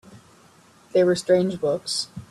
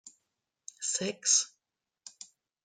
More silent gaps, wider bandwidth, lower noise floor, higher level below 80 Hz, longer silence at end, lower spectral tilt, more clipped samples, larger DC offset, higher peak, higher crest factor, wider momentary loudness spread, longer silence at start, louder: neither; first, 12.5 kHz vs 10.5 kHz; second, -54 dBFS vs -87 dBFS; first, -64 dBFS vs -86 dBFS; second, 0.05 s vs 0.55 s; first, -5 dB/octave vs -0.5 dB/octave; neither; neither; first, -8 dBFS vs -12 dBFS; second, 16 dB vs 24 dB; second, 7 LU vs 25 LU; about the same, 0.1 s vs 0.05 s; first, -22 LUFS vs -29 LUFS